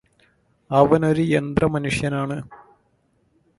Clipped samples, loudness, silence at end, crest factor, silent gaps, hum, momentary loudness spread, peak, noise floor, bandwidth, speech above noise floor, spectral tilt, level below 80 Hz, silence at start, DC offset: under 0.1%; -20 LUFS; 1.05 s; 22 dB; none; none; 12 LU; 0 dBFS; -65 dBFS; 11.5 kHz; 45 dB; -7 dB/octave; -46 dBFS; 0.7 s; under 0.1%